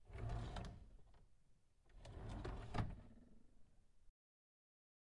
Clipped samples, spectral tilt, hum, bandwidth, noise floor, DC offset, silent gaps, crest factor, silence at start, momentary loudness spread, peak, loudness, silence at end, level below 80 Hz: under 0.1%; -6.5 dB/octave; none; 11 kHz; -72 dBFS; under 0.1%; none; 22 dB; 0 s; 18 LU; -30 dBFS; -51 LUFS; 0.95 s; -58 dBFS